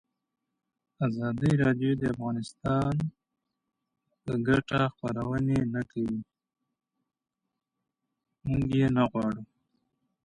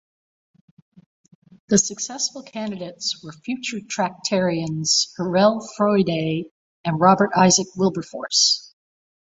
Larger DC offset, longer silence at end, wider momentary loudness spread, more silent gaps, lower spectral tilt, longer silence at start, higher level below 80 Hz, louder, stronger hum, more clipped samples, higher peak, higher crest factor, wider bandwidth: neither; first, 0.8 s vs 0.65 s; second, 9 LU vs 14 LU; second, none vs 6.51-6.84 s; first, -8 dB/octave vs -3.5 dB/octave; second, 1 s vs 1.7 s; first, -54 dBFS vs -62 dBFS; second, -29 LUFS vs -20 LUFS; neither; neither; second, -12 dBFS vs -2 dBFS; about the same, 18 dB vs 20 dB; first, 11 kHz vs 8.2 kHz